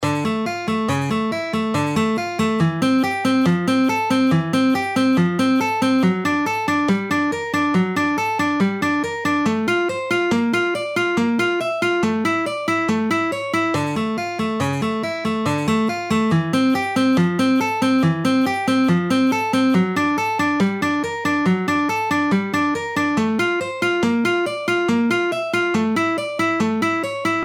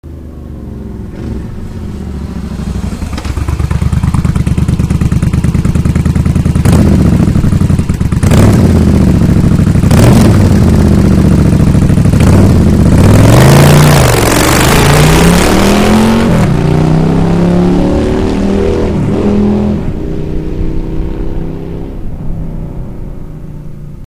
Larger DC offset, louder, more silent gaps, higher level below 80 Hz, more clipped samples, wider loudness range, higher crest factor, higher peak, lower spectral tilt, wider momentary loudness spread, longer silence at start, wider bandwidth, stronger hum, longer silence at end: neither; second, -19 LUFS vs -8 LUFS; neither; second, -58 dBFS vs -16 dBFS; second, under 0.1% vs 2%; second, 2 LU vs 13 LU; first, 14 dB vs 8 dB; second, -6 dBFS vs 0 dBFS; about the same, -5.5 dB/octave vs -6.5 dB/octave; second, 4 LU vs 17 LU; about the same, 0 s vs 0.05 s; about the same, 17 kHz vs 16.5 kHz; neither; about the same, 0 s vs 0 s